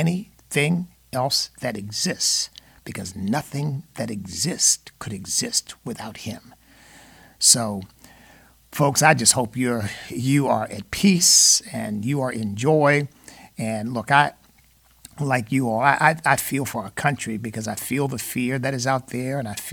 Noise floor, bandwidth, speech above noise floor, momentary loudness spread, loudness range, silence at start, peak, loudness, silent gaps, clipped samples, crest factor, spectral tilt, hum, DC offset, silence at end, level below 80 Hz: -56 dBFS; 19 kHz; 34 dB; 17 LU; 6 LU; 0 s; -2 dBFS; -21 LUFS; none; under 0.1%; 22 dB; -3 dB/octave; none; under 0.1%; 0 s; -56 dBFS